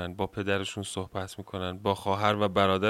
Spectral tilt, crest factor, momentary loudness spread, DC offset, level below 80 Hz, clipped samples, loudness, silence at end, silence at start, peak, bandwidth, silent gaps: -5 dB/octave; 20 dB; 11 LU; under 0.1%; -60 dBFS; under 0.1%; -30 LUFS; 0 s; 0 s; -8 dBFS; 15.5 kHz; none